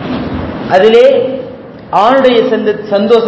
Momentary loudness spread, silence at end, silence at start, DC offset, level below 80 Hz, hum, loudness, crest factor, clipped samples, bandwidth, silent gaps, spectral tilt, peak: 14 LU; 0 s; 0 s; under 0.1%; -36 dBFS; none; -9 LUFS; 10 dB; 3%; 8 kHz; none; -6.5 dB/octave; 0 dBFS